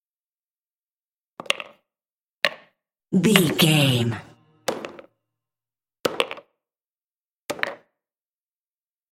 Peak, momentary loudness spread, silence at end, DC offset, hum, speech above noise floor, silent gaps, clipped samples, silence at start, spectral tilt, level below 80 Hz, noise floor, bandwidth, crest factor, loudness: 0 dBFS; 21 LU; 1.35 s; under 0.1%; none; over 71 dB; 2.21-2.41 s, 6.87-6.91 s, 7.02-7.24 s, 7.31-7.46 s; under 0.1%; 1.5 s; -4.5 dB/octave; -68 dBFS; under -90 dBFS; 16.5 kHz; 26 dB; -22 LUFS